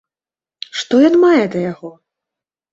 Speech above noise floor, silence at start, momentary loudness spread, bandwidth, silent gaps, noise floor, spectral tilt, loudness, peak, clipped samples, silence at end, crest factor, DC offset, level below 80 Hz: over 78 dB; 0.75 s; 20 LU; 7.8 kHz; none; under -90 dBFS; -5.5 dB/octave; -14 LUFS; -2 dBFS; under 0.1%; 0.8 s; 14 dB; under 0.1%; -60 dBFS